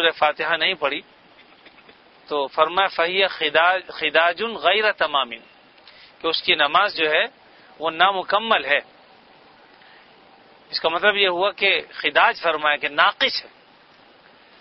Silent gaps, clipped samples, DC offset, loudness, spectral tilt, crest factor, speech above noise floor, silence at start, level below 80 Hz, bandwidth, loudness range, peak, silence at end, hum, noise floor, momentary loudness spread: none; under 0.1%; under 0.1%; -20 LUFS; -4.5 dB/octave; 22 dB; 31 dB; 0 s; -64 dBFS; 6 kHz; 4 LU; 0 dBFS; 1.15 s; none; -52 dBFS; 9 LU